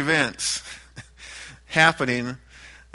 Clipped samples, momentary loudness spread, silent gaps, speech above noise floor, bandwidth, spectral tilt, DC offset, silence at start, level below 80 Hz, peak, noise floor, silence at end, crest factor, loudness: under 0.1%; 22 LU; none; 25 dB; 11.5 kHz; -3 dB/octave; under 0.1%; 0 s; -52 dBFS; -2 dBFS; -47 dBFS; 0.25 s; 24 dB; -22 LUFS